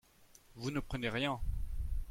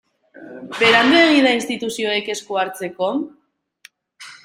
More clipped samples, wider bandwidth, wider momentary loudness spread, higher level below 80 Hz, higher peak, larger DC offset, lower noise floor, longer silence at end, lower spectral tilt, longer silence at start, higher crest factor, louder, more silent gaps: neither; about the same, 16.5 kHz vs 16 kHz; second, 8 LU vs 15 LU; first, -42 dBFS vs -64 dBFS; second, -22 dBFS vs -2 dBFS; neither; first, -63 dBFS vs -51 dBFS; about the same, 0 s vs 0.1 s; first, -5.5 dB/octave vs -3 dB/octave; second, 0.2 s vs 0.4 s; about the same, 16 dB vs 18 dB; second, -39 LUFS vs -17 LUFS; neither